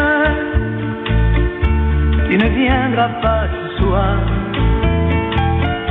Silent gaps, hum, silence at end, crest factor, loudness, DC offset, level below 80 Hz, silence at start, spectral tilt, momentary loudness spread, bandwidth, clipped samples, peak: none; none; 0 s; 12 dB; -16 LUFS; under 0.1%; -20 dBFS; 0 s; -10 dB/octave; 5 LU; 4.1 kHz; under 0.1%; -2 dBFS